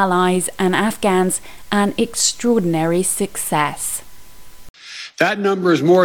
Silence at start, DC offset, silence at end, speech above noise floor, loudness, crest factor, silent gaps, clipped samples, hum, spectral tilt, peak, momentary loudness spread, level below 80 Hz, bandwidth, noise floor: 0 s; 2%; 0 s; 25 dB; -18 LUFS; 16 dB; 4.70-4.74 s; under 0.1%; none; -4 dB/octave; -2 dBFS; 8 LU; -50 dBFS; 19 kHz; -42 dBFS